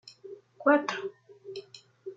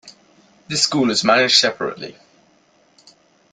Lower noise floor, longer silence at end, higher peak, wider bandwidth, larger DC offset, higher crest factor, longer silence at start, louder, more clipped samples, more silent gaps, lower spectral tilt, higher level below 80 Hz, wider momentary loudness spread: second, -49 dBFS vs -57 dBFS; second, 0.05 s vs 1.4 s; second, -8 dBFS vs -2 dBFS; second, 7.8 kHz vs 12 kHz; neither; about the same, 22 dB vs 20 dB; about the same, 0.05 s vs 0.05 s; second, -27 LUFS vs -16 LUFS; neither; neither; first, -4 dB/octave vs -2.5 dB/octave; second, -86 dBFS vs -62 dBFS; first, 24 LU vs 17 LU